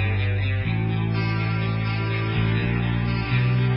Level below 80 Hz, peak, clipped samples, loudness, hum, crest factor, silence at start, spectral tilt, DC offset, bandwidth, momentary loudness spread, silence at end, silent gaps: -36 dBFS; -10 dBFS; under 0.1%; -23 LUFS; none; 12 dB; 0 s; -11.5 dB/octave; under 0.1%; 5.6 kHz; 2 LU; 0 s; none